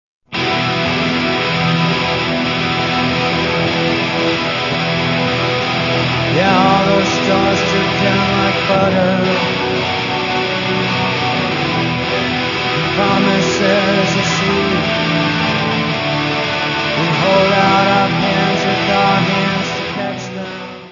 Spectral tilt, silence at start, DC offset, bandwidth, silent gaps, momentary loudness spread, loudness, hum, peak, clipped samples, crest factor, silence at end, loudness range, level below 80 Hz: -5 dB/octave; 0.3 s; under 0.1%; 7.4 kHz; none; 4 LU; -14 LUFS; none; 0 dBFS; under 0.1%; 16 dB; 0 s; 2 LU; -42 dBFS